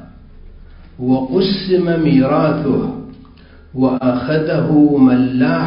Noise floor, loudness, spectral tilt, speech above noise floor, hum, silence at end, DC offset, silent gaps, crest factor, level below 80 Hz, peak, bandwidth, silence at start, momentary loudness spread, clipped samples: -41 dBFS; -15 LUFS; -12.5 dB/octave; 28 dB; none; 0 s; under 0.1%; none; 14 dB; -42 dBFS; 0 dBFS; 5.4 kHz; 0 s; 8 LU; under 0.1%